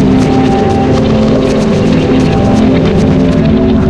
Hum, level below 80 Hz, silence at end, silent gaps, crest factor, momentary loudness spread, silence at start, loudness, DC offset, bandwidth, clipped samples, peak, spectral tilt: none; -22 dBFS; 0 s; none; 8 dB; 1 LU; 0 s; -9 LUFS; under 0.1%; 10 kHz; under 0.1%; 0 dBFS; -7.5 dB/octave